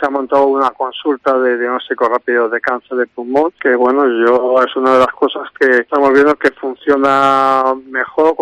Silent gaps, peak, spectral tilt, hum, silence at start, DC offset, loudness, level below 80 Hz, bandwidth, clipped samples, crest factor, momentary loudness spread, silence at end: none; -2 dBFS; -5 dB/octave; none; 0 s; under 0.1%; -13 LUFS; -56 dBFS; 10.5 kHz; under 0.1%; 12 dB; 7 LU; 0 s